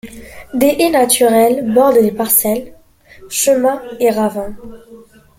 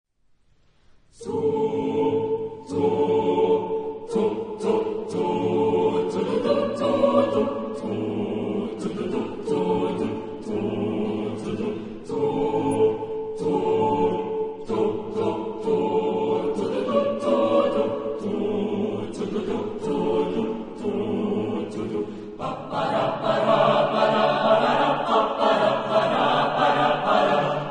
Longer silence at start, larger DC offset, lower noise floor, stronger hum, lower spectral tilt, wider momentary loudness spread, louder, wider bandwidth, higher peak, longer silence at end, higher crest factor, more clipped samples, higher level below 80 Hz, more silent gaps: second, 0.05 s vs 1.2 s; neither; second, -42 dBFS vs -61 dBFS; neither; second, -3.5 dB/octave vs -6.5 dB/octave; first, 12 LU vs 9 LU; first, -13 LUFS vs -24 LUFS; first, 17 kHz vs 10.5 kHz; first, 0 dBFS vs -6 dBFS; first, 0.4 s vs 0 s; about the same, 14 dB vs 16 dB; neither; first, -46 dBFS vs -56 dBFS; neither